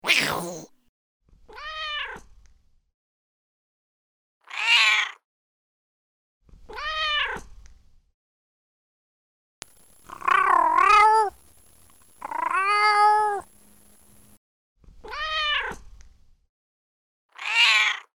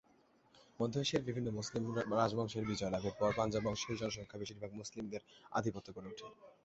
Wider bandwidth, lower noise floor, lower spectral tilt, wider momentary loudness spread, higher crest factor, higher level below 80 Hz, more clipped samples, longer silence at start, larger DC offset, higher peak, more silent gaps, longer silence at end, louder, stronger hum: first, over 20 kHz vs 8 kHz; second, -57 dBFS vs -70 dBFS; second, -0.5 dB/octave vs -5 dB/octave; first, 20 LU vs 14 LU; about the same, 24 dB vs 22 dB; first, -54 dBFS vs -64 dBFS; neither; second, 0.05 s vs 0.55 s; neither; first, -4 dBFS vs -18 dBFS; first, 0.89-1.20 s, 2.94-4.41 s, 5.24-6.40 s, 8.14-9.62 s, 14.37-14.76 s, 16.49-17.29 s vs none; about the same, 0.15 s vs 0.15 s; first, -21 LUFS vs -39 LUFS; neither